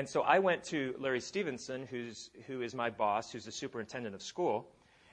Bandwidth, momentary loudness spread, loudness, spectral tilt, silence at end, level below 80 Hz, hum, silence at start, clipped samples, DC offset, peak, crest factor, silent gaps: 10 kHz; 14 LU; -36 LUFS; -4.5 dB/octave; 0.45 s; -74 dBFS; none; 0 s; under 0.1%; under 0.1%; -12 dBFS; 24 dB; none